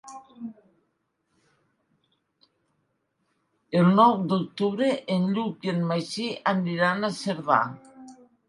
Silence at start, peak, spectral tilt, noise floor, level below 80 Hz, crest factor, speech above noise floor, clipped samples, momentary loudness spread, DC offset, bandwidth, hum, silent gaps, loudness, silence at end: 0.05 s; -6 dBFS; -6.5 dB/octave; -75 dBFS; -74 dBFS; 22 dB; 51 dB; under 0.1%; 21 LU; under 0.1%; 11.5 kHz; none; none; -24 LUFS; 0.35 s